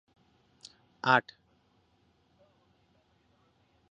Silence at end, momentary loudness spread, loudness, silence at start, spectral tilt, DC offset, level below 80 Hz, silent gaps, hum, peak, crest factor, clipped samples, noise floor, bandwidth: 2.7 s; 27 LU; -28 LUFS; 1.05 s; -2 dB/octave; under 0.1%; -78 dBFS; none; none; -8 dBFS; 28 dB; under 0.1%; -70 dBFS; 8 kHz